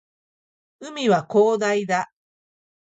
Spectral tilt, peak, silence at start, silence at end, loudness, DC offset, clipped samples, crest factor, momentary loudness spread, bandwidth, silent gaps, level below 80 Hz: -5 dB/octave; -6 dBFS; 0.8 s; 0.9 s; -21 LUFS; under 0.1%; under 0.1%; 18 dB; 18 LU; 8 kHz; none; -72 dBFS